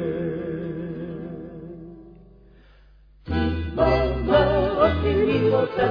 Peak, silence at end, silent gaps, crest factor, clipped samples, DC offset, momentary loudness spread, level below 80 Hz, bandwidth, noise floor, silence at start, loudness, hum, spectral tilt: -4 dBFS; 0 s; none; 18 dB; under 0.1%; under 0.1%; 18 LU; -36 dBFS; 5.2 kHz; -52 dBFS; 0 s; -22 LUFS; none; -9 dB/octave